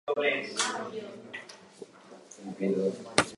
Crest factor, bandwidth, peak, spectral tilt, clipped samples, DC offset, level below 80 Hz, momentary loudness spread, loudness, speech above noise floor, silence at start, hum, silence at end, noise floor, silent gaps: 32 dB; 11.5 kHz; 0 dBFS; -3 dB/octave; under 0.1%; under 0.1%; -68 dBFS; 22 LU; -31 LUFS; 21 dB; 0.05 s; none; 0 s; -52 dBFS; none